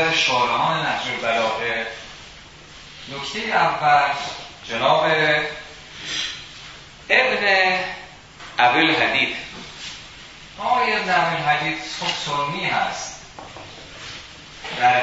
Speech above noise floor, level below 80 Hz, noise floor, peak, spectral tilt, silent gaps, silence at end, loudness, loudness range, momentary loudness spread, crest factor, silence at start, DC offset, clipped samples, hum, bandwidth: 22 dB; -54 dBFS; -42 dBFS; -2 dBFS; -3 dB/octave; none; 0 s; -20 LUFS; 5 LU; 21 LU; 22 dB; 0 s; under 0.1%; under 0.1%; none; 8 kHz